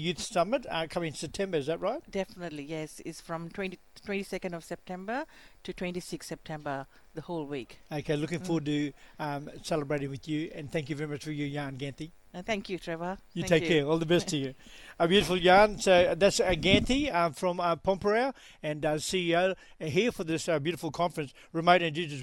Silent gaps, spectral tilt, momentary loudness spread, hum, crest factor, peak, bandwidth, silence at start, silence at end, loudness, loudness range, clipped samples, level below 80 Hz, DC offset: none; -5 dB/octave; 15 LU; none; 22 dB; -8 dBFS; 18.5 kHz; 0 s; 0 s; -30 LUFS; 13 LU; under 0.1%; -52 dBFS; under 0.1%